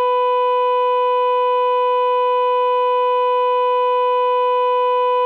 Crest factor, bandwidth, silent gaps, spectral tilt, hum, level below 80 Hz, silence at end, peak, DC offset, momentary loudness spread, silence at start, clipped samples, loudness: 6 dB; 4.7 kHz; none; -0.5 dB/octave; none; -88 dBFS; 0 s; -10 dBFS; under 0.1%; 0 LU; 0 s; under 0.1%; -17 LUFS